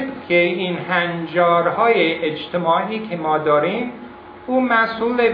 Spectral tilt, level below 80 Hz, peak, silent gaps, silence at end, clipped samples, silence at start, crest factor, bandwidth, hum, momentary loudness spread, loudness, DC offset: -8.5 dB/octave; -58 dBFS; -2 dBFS; none; 0 s; under 0.1%; 0 s; 16 dB; 5.2 kHz; none; 9 LU; -18 LUFS; under 0.1%